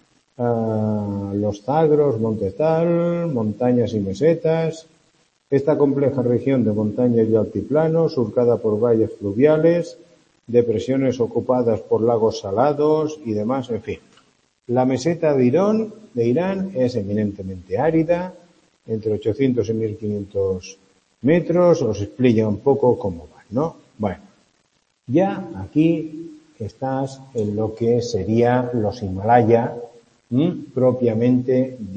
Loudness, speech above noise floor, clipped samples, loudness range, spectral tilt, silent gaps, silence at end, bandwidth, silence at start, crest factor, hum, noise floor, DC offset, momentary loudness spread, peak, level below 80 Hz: -20 LUFS; 46 dB; under 0.1%; 4 LU; -8 dB/octave; none; 0 s; 8.6 kHz; 0.4 s; 18 dB; none; -65 dBFS; under 0.1%; 10 LU; -2 dBFS; -56 dBFS